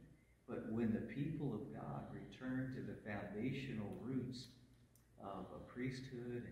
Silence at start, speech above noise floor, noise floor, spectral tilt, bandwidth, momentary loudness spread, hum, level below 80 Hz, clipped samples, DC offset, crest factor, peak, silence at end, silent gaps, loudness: 0 s; 23 dB; -69 dBFS; -7.5 dB/octave; 15 kHz; 11 LU; none; -68 dBFS; under 0.1%; under 0.1%; 16 dB; -30 dBFS; 0 s; none; -47 LUFS